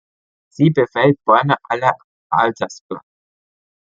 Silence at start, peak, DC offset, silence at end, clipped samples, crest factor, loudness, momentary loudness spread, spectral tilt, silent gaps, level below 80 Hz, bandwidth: 0.6 s; -2 dBFS; under 0.1%; 0.9 s; under 0.1%; 18 dB; -17 LUFS; 17 LU; -7 dB/octave; 2.04-2.30 s, 2.81-2.89 s; -62 dBFS; 7.6 kHz